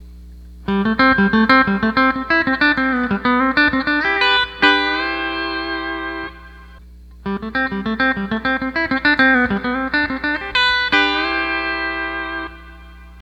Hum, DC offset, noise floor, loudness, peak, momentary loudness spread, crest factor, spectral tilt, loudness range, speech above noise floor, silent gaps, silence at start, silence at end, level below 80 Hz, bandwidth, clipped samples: 60 Hz at -40 dBFS; under 0.1%; -40 dBFS; -17 LUFS; 0 dBFS; 11 LU; 18 dB; -5.5 dB/octave; 7 LU; 26 dB; none; 0 s; 0 s; -40 dBFS; 8.4 kHz; under 0.1%